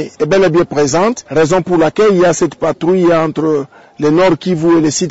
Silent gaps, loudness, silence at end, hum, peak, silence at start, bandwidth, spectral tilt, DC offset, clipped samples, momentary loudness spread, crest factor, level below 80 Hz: none; -12 LUFS; 0 s; none; -4 dBFS; 0 s; 8 kHz; -5.5 dB/octave; 0.9%; under 0.1%; 5 LU; 8 dB; -44 dBFS